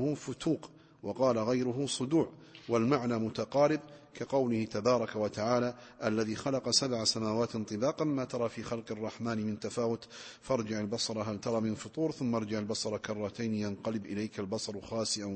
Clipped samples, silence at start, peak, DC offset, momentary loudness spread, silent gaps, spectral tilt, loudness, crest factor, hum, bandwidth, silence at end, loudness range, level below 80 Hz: under 0.1%; 0 s; -14 dBFS; under 0.1%; 8 LU; none; -5 dB/octave; -33 LUFS; 20 dB; none; 8.8 kHz; 0 s; 4 LU; -66 dBFS